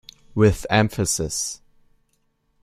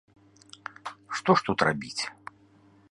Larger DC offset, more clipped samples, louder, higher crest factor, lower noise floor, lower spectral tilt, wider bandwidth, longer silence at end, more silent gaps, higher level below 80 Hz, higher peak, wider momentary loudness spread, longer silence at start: neither; neither; first, -21 LUFS vs -27 LUFS; second, 20 dB vs 26 dB; first, -68 dBFS vs -59 dBFS; about the same, -4.5 dB/octave vs -4.5 dB/octave; first, 15 kHz vs 11.5 kHz; first, 1.05 s vs 0.8 s; neither; first, -44 dBFS vs -62 dBFS; first, -2 dBFS vs -6 dBFS; second, 12 LU vs 20 LU; second, 0.35 s vs 0.85 s